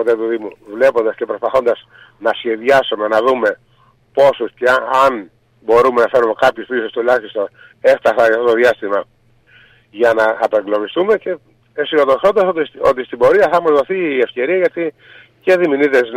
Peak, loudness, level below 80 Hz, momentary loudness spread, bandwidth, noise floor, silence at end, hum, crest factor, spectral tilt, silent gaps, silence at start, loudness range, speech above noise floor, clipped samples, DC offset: -2 dBFS; -15 LUFS; -54 dBFS; 11 LU; 14.5 kHz; -53 dBFS; 0 s; none; 12 dB; -5 dB/octave; none; 0 s; 2 LU; 38 dB; under 0.1%; under 0.1%